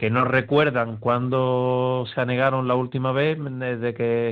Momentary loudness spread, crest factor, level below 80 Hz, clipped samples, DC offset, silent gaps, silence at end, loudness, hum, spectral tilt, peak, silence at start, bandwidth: 5 LU; 16 dB; -60 dBFS; under 0.1%; under 0.1%; none; 0 s; -22 LUFS; none; -9 dB/octave; -6 dBFS; 0 s; 4.8 kHz